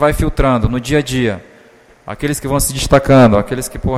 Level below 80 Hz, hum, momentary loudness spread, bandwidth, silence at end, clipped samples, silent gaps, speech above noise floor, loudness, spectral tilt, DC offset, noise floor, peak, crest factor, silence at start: -26 dBFS; none; 12 LU; 15.5 kHz; 0 s; under 0.1%; none; 32 dB; -14 LUFS; -5.5 dB/octave; under 0.1%; -45 dBFS; 0 dBFS; 14 dB; 0 s